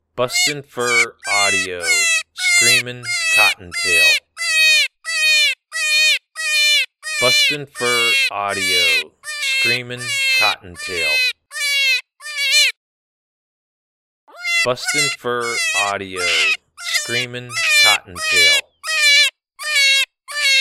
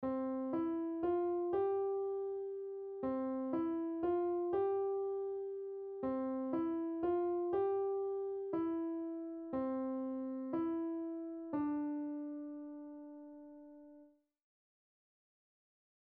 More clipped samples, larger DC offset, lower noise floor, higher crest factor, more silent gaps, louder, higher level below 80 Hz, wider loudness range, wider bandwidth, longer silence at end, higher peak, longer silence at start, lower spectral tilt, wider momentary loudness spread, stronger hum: neither; neither; first, under -90 dBFS vs -64 dBFS; first, 18 dB vs 12 dB; first, 12.77-14.27 s vs none; first, -15 LUFS vs -39 LUFS; first, -60 dBFS vs -74 dBFS; second, 5 LU vs 8 LU; first, 17.5 kHz vs 3.7 kHz; second, 0 s vs 2.05 s; first, 0 dBFS vs -26 dBFS; first, 0.15 s vs 0 s; second, 0 dB/octave vs -7.5 dB/octave; about the same, 9 LU vs 11 LU; neither